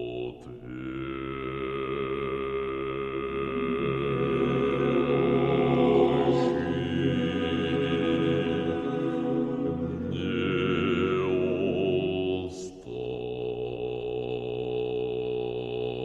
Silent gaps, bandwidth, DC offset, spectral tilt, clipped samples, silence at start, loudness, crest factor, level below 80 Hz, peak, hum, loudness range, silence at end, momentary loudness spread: none; 8.4 kHz; under 0.1%; -7.5 dB/octave; under 0.1%; 0 s; -28 LUFS; 16 dB; -50 dBFS; -10 dBFS; none; 7 LU; 0 s; 10 LU